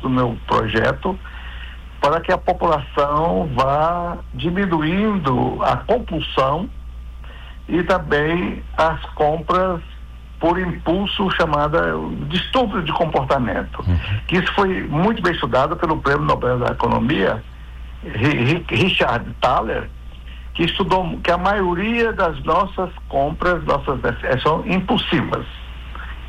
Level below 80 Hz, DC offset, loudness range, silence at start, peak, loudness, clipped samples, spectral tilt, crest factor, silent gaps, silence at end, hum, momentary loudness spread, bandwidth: -32 dBFS; under 0.1%; 2 LU; 0 s; -6 dBFS; -19 LUFS; under 0.1%; -7 dB/octave; 12 dB; none; 0 s; none; 16 LU; 13.5 kHz